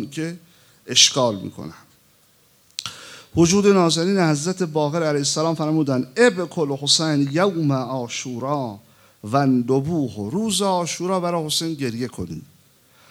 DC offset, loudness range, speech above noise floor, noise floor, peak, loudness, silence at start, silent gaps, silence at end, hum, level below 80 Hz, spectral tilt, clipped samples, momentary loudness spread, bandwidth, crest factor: under 0.1%; 3 LU; 36 dB; -57 dBFS; -2 dBFS; -20 LUFS; 0 s; none; 0.65 s; none; -58 dBFS; -4 dB/octave; under 0.1%; 16 LU; 17 kHz; 20 dB